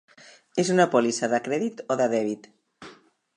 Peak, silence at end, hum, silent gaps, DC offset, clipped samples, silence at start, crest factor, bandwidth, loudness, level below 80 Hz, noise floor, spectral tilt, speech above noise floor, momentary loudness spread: -6 dBFS; 0.45 s; none; none; under 0.1%; under 0.1%; 0.55 s; 20 dB; 10.5 kHz; -24 LUFS; -74 dBFS; -52 dBFS; -4.5 dB/octave; 28 dB; 11 LU